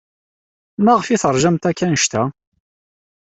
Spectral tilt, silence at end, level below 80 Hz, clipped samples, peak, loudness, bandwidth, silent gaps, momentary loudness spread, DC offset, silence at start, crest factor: -4.5 dB/octave; 1 s; -52 dBFS; under 0.1%; -2 dBFS; -17 LUFS; 8.4 kHz; none; 8 LU; under 0.1%; 0.8 s; 16 dB